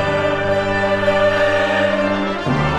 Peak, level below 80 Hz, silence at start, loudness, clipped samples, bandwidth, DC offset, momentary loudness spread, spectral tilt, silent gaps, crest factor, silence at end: -4 dBFS; -38 dBFS; 0 s; -17 LUFS; under 0.1%; 11 kHz; under 0.1%; 4 LU; -6 dB/octave; none; 12 dB; 0 s